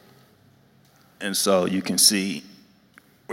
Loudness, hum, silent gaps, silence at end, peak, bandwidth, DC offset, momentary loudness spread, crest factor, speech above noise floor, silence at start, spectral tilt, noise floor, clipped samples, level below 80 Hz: -20 LUFS; none; none; 0 s; -2 dBFS; 16.5 kHz; under 0.1%; 15 LU; 24 dB; 35 dB; 1.2 s; -2.5 dB/octave; -57 dBFS; under 0.1%; -72 dBFS